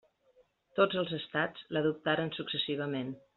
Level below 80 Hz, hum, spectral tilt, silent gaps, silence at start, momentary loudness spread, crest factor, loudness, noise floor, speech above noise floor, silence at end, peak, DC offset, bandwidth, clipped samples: -74 dBFS; none; -3 dB/octave; none; 0.75 s; 6 LU; 22 dB; -33 LUFS; -68 dBFS; 35 dB; 0.2 s; -12 dBFS; under 0.1%; 4.7 kHz; under 0.1%